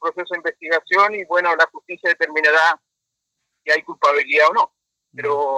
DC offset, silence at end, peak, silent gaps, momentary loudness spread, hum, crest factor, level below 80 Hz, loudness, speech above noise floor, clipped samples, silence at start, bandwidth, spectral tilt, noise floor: under 0.1%; 0 s; -2 dBFS; none; 10 LU; none; 18 dB; -78 dBFS; -18 LUFS; 61 dB; under 0.1%; 0 s; 11 kHz; -2.5 dB/octave; -80 dBFS